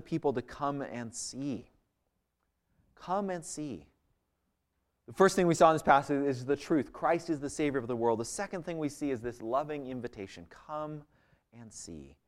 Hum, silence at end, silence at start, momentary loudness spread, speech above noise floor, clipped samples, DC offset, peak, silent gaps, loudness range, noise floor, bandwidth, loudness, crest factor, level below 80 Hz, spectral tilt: none; 0.2 s; 0 s; 20 LU; 49 dB; under 0.1%; under 0.1%; -8 dBFS; none; 12 LU; -81 dBFS; 15 kHz; -31 LUFS; 24 dB; -62 dBFS; -5.5 dB/octave